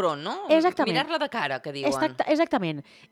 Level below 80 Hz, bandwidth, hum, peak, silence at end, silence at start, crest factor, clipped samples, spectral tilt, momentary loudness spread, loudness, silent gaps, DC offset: -68 dBFS; 14.5 kHz; none; -8 dBFS; 0.3 s; 0 s; 16 dB; under 0.1%; -5 dB/octave; 8 LU; -25 LUFS; none; under 0.1%